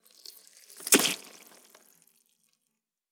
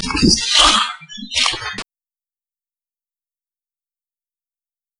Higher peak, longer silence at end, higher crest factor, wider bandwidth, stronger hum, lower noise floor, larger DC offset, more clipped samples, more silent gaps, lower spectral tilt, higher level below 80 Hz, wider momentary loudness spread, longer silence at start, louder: second, -4 dBFS vs 0 dBFS; second, 1.95 s vs 3.15 s; first, 28 dB vs 20 dB; first, 19.5 kHz vs 12 kHz; neither; second, -83 dBFS vs under -90 dBFS; neither; neither; neither; second, -0.5 dB/octave vs -2 dB/octave; second, under -90 dBFS vs -38 dBFS; first, 26 LU vs 18 LU; first, 0.8 s vs 0 s; second, -24 LUFS vs -14 LUFS